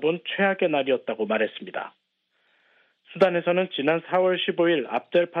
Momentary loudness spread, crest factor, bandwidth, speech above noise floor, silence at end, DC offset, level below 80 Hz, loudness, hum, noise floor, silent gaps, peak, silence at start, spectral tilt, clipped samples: 12 LU; 18 dB; 5.6 kHz; 47 dB; 0 s; under 0.1%; -74 dBFS; -24 LUFS; none; -70 dBFS; none; -6 dBFS; 0 s; -7.5 dB/octave; under 0.1%